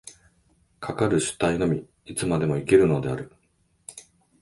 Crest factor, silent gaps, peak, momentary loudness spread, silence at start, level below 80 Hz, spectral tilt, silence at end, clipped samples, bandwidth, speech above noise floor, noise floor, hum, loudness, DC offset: 20 dB; none; -6 dBFS; 24 LU; 0.05 s; -50 dBFS; -5.5 dB/octave; 0.4 s; under 0.1%; 11.5 kHz; 44 dB; -67 dBFS; none; -24 LUFS; under 0.1%